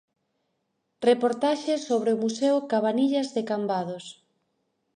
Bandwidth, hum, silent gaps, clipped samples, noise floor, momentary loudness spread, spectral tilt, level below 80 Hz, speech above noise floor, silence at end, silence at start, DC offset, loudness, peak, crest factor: 10 kHz; none; none; under 0.1%; -77 dBFS; 7 LU; -5 dB/octave; -80 dBFS; 52 dB; 0.85 s; 1 s; under 0.1%; -25 LUFS; -8 dBFS; 18 dB